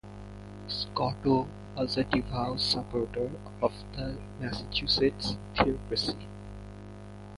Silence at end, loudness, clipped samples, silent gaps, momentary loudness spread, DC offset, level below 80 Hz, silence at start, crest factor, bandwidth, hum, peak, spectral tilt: 0 s; -31 LUFS; under 0.1%; none; 18 LU; under 0.1%; -46 dBFS; 0.05 s; 24 dB; 11.5 kHz; 50 Hz at -50 dBFS; -8 dBFS; -5.5 dB/octave